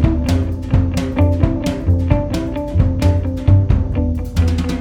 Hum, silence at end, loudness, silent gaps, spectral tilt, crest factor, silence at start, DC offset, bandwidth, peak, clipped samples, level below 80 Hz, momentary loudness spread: none; 0 s; -17 LUFS; none; -8 dB/octave; 14 dB; 0 s; under 0.1%; 12.5 kHz; 0 dBFS; under 0.1%; -22 dBFS; 5 LU